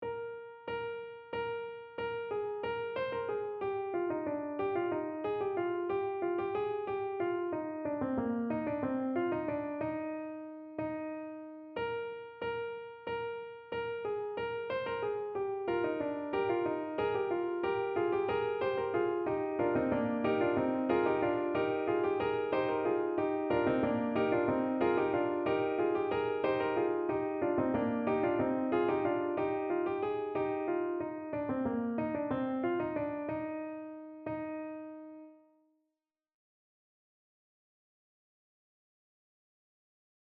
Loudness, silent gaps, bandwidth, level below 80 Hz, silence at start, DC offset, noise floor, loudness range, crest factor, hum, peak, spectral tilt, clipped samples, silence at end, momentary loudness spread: -34 LUFS; none; 5.2 kHz; -68 dBFS; 0 s; under 0.1%; -89 dBFS; 8 LU; 16 dB; none; -18 dBFS; -9.5 dB/octave; under 0.1%; 4.85 s; 10 LU